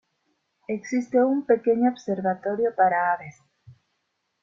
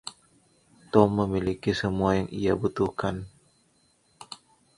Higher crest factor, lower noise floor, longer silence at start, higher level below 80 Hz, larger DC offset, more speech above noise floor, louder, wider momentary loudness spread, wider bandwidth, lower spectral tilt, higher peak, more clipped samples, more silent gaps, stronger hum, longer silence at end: second, 18 dB vs 26 dB; first, -76 dBFS vs -66 dBFS; first, 0.7 s vs 0.05 s; second, -72 dBFS vs -50 dBFS; neither; first, 53 dB vs 41 dB; about the same, -24 LUFS vs -26 LUFS; second, 12 LU vs 22 LU; second, 7.4 kHz vs 11.5 kHz; about the same, -7 dB/octave vs -7 dB/octave; second, -6 dBFS vs -2 dBFS; neither; neither; neither; first, 0.7 s vs 0.4 s